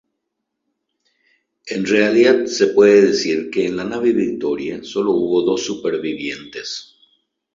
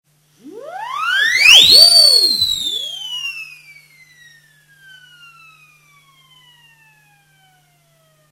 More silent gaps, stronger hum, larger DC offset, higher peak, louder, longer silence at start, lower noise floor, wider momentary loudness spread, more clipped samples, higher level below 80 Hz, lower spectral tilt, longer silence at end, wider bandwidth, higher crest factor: neither; neither; neither; about the same, -2 dBFS vs 0 dBFS; second, -17 LUFS vs -9 LUFS; first, 1.65 s vs 0.45 s; first, -77 dBFS vs -56 dBFS; second, 15 LU vs 26 LU; second, under 0.1% vs 0.2%; about the same, -58 dBFS vs -54 dBFS; first, -4.5 dB/octave vs 1.5 dB/octave; second, 0.75 s vs 4.9 s; second, 7.6 kHz vs 19 kHz; about the same, 16 dB vs 16 dB